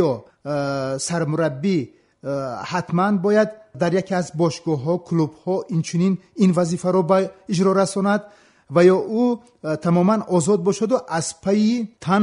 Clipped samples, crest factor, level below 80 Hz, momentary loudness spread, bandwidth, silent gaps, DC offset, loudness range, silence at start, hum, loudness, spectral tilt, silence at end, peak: under 0.1%; 18 dB; -62 dBFS; 8 LU; 11 kHz; none; under 0.1%; 3 LU; 0 s; none; -21 LUFS; -6.5 dB/octave; 0 s; -4 dBFS